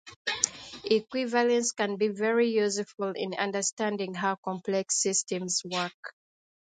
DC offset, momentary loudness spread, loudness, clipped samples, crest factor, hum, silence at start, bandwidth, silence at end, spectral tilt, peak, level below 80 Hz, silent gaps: under 0.1%; 8 LU; -28 LUFS; under 0.1%; 28 dB; none; 0.05 s; 9.6 kHz; 0.65 s; -2.5 dB/octave; -2 dBFS; -74 dBFS; 0.16-0.25 s, 3.73-3.77 s, 4.38-4.43 s, 5.94-6.03 s